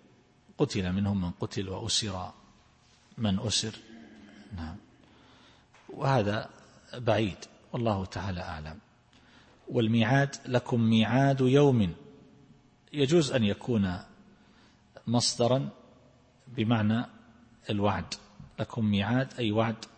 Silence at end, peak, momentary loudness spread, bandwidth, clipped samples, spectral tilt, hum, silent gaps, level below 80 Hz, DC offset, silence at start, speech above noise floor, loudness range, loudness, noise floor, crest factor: 0.1 s; -10 dBFS; 18 LU; 8.8 kHz; under 0.1%; -5.5 dB/octave; none; none; -58 dBFS; under 0.1%; 0.6 s; 34 dB; 8 LU; -29 LUFS; -62 dBFS; 20 dB